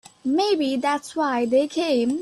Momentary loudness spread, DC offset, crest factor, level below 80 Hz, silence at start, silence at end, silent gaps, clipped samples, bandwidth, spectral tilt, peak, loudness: 4 LU; under 0.1%; 12 dB; -66 dBFS; 0.25 s; 0 s; none; under 0.1%; 12.5 kHz; -3.5 dB/octave; -10 dBFS; -22 LUFS